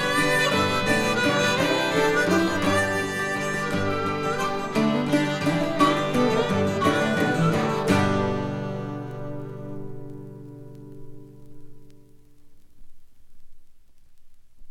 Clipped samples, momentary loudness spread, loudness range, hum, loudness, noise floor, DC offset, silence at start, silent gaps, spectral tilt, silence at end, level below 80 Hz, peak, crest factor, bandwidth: under 0.1%; 17 LU; 17 LU; none; -23 LUFS; -47 dBFS; under 0.1%; 0 s; none; -5 dB/octave; 0 s; -50 dBFS; -6 dBFS; 18 dB; 15.5 kHz